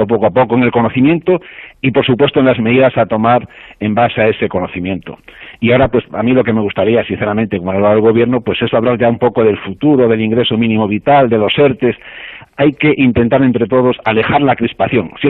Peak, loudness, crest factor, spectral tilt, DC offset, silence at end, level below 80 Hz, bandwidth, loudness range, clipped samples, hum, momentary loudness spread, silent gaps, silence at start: -2 dBFS; -12 LUFS; 10 dB; -10.5 dB/octave; under 0.1%; 0 s; -42 dBFS; 4.1 kHz; 2 LU; under 0.1%; none; 7 LU; none; 0 s